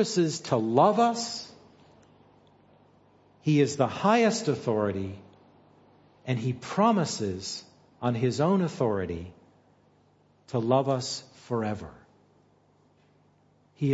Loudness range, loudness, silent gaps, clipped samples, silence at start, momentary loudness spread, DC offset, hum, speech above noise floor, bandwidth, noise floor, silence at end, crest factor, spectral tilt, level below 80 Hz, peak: 4 LU; -27 LUFS; none; under 0.1%; 0 s; 16 LU; under 0.1%; 50 Hz at -55 dBFS; 38 dB; 8 kHz; -64 dBFS; 0 s; 22 dB; -5.5 dB/octave; -64 dBFS; -8 dBFS